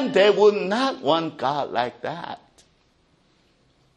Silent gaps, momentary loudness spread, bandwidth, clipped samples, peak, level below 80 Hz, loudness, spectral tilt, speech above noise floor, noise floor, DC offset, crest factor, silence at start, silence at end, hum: none; 17 LU; 9.8 kHz; under 0.1%; -6 dBFS; -68 dBFS; -21 LUFS; -5 dB/octave; 41 dB; -62 dBFS; under 0.1%; 18 dB; 0 s; 1.6 s; none